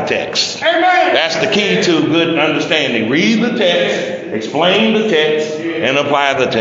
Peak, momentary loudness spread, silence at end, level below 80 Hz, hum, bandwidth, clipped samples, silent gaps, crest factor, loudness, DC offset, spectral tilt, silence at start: 0 dBFS; 6 LU; 0 s; -58 dBFS; none; 8 kHz; under 0.1%; none; 14 dB; -13 LUFS; under 0.1%; -4 dB/octave; 0 s